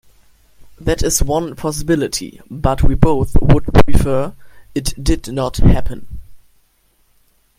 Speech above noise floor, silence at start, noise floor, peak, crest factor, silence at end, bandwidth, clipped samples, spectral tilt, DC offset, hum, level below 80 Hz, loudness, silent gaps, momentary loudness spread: 45 dB; 0.6 s; -57 dBFS; 0 dBFS; 14 dB; 1.25 s; 15.5 kHz; under 0.1%; -5.5 dB/octave; under 0.1%; none; -22 dBFS; -17 LUFS; none; 13 LU